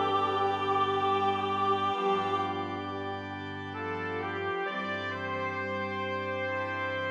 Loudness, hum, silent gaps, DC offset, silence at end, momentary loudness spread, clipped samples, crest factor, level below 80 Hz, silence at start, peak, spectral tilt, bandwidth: -31 LUFS; none; none; under 0.1%; 0 s; 8 LU; under 0.1%; 14 dB; -78 dBFS; 0 s; -16 dBFS; -6 dB/octave; 9.6 kHz